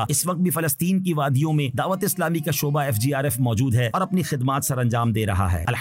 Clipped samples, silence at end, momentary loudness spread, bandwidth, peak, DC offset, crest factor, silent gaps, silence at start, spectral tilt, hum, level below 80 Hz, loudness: under 0.1%; 0 s; 2 LU; 16 kHz; -12 dBFS; under 0.1%; 10 dB; none; 0 s; -5.5 dB/octave; none; -48 dBFS; -22 LUFS